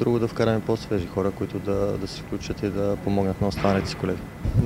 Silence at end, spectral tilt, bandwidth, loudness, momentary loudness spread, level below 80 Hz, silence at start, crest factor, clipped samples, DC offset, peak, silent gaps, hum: 0 s; -7 dB/octave; 16 kHz; -26 LUFS; 7 LU; -40 dBFS; 0 s; 18 dB; under 0.1%; under 0.1%; -6 dBFS; none; none